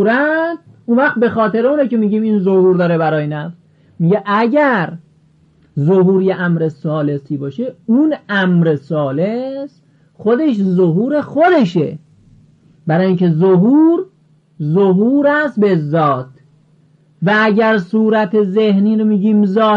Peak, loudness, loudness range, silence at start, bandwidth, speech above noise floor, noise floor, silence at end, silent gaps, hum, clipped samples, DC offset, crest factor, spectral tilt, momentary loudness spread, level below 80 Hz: -4 dBFS; -14 LUFS; 3 LU; 0 s; 6.6 kHz; 38 dB; -51 dBFS; 0 s; none; none; under 0.1%; under 0.1%; 10 dB; -9 dB/octave; 11 LU; -62 dBFS